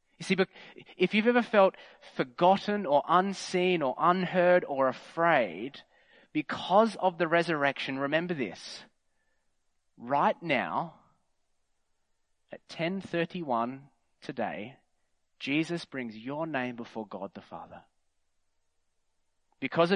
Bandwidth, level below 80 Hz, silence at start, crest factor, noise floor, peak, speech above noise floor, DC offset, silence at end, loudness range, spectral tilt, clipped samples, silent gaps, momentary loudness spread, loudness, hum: 10.5 kHz; -76 dBFS; 0.2 s; 22 dB; -74 dBFS; -8 dBFS; 45 dB; under 0.1%; 0 s; 10 LU; -5.5 dB/octave; under 0.1%; none; 17 LU; -29 LUFS; none